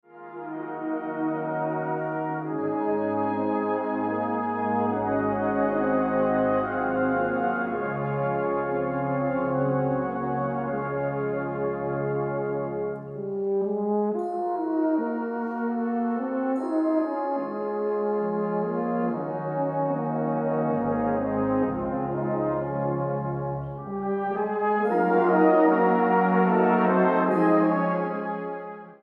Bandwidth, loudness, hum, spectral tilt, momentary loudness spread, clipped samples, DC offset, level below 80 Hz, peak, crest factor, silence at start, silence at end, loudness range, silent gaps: 5.2 kHz; -26 LUFS; none; -10.5 dB/octave; 9 LU; under 0.1%; under 0.1%; -58 dBFS; -8 dBFS; 16 dB; 0.15 s; 0.05 s; 6 LU; none